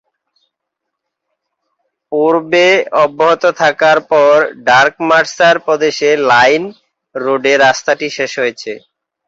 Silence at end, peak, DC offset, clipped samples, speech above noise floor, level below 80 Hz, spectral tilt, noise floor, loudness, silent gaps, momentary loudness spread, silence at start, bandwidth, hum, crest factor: 0.5 s; 0 dBFS; under 0.1%; under 0.1%; 65 dB; -60 dBFS; -3.5 dB/octave; -76 dBFS; -11 LUFS; none; 10 LU; 2.1 s; 7.8 kHz; none; 12 dB